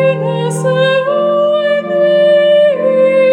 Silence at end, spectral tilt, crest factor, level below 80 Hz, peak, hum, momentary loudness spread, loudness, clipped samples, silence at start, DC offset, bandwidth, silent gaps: 0 s; -5.5 dB/octave; 10 dB; -72 dBFS; -2 dBFS; none; 6 LU; -11 LUFS; under 0.1%; 0 s; under 0.1%; 11 kHz; none